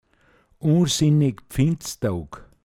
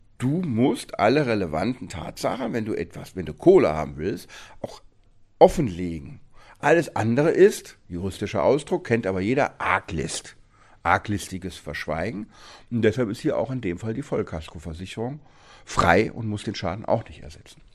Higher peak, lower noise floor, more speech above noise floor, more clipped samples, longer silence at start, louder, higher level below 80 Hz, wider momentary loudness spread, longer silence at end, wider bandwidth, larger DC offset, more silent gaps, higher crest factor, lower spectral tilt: second, -8 dBFS vs 0 dBFS; first, -60 dBFS vs -54 dBFS; first, 39 dB vs 31 dB; neither; first, 0.65 s vs 0.2 s; about the same, -22 LUFS vs -24 LUFS; about the same, -46 dBFS vs -46 dBFS; second, 9 LU vs 17 LU; about the same, 0.2 s vs 0.2 s; first, 15.5 kHz vs 14 kHz; neither; neither; second, 16 dB vs 24 dB; about the same, -6 dB/octave vs -6 dB/octave